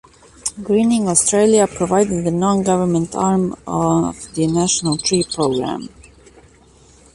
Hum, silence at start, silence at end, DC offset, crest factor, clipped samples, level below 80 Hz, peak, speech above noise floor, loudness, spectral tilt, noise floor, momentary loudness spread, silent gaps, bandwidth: none; 0.45 s; 1.3 s; under 0.1%; 18 dB; under 0.1%; -46 dBFS; 0 dBFS; 32 dB; -17 LUFS; -4.5 dB/octave; -48 dBFS; 10 LU; none; 11.5 kHz